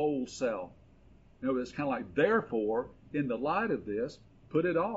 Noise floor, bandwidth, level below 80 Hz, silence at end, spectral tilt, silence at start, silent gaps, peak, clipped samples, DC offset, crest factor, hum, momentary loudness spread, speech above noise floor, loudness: -59 dBFS; 8 kHz; -62 dBFS; 0 s; -5.5 dB/octave; 0 s; none; -14 dBFS; under 0.1%; under 0.1%; 18 dB; none; 10 LU; 27 dB; -33 LUFS